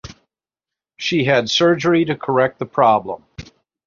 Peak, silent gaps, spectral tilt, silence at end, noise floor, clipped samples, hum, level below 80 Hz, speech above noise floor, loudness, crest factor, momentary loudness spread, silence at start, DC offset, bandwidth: -2 dBFS; none; -5 dB/octave; 0.45 s; -88 dBFS; under 0.1%; none; -52 dBFS; 71 dB; -17 LUFS; 18 dB; 9 LU; 0.05 s; under 0.1%; 7.4 kHz